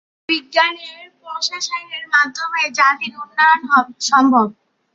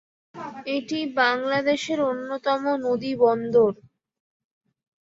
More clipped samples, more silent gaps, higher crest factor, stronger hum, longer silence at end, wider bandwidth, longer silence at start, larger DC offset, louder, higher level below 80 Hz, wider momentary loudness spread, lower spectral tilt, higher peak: neither; neither; about the same, 16 dB vs 18 dB; neither; second, 0.4 s vs 1.3 s; about the same, 7.8 kHz vs 7.8 kHz; about the same, 0.3 s vs 0.35 s; neither; first, -16 LUFS vs -23 LUFS; about the same, -72 dBFS vs -68 dBFS; about the same, 11 LU vs 11 LU; second, -2 dB/octave vs -4.5 dB/octave; first, 0 dBFS vs -6 dBFS